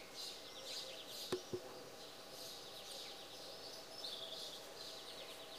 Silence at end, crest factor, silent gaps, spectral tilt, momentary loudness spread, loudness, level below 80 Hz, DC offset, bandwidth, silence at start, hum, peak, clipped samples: 0 s; 24 dB; none; -2 dB/octave; 6 LU; -49 LUFS; -78 dBFS; under 0.1%; 15.5 kHz; 0 s; none; -28 dBFS; under 0.1%